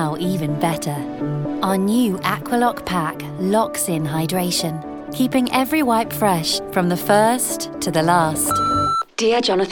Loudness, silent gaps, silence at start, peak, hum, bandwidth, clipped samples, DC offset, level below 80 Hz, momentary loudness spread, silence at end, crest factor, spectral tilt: -19 LUFS; none; 0 s; -2 dBFS; none; 19 kHz; under 0.1%; under 0.1%; -50 dBFS; 7 LU; 0 s; 16 dB; -4.5 dB/octave